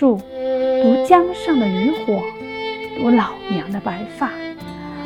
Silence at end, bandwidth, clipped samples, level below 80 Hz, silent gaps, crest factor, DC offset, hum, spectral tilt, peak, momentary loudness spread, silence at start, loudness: 0 s; 12.5 kHz; under 0.1%; -52 dBFS; none; 18 dB; under 0.1%; none; -7 dB/octave; 0 dBFS; 13 LU; 0 s; -19 LUFS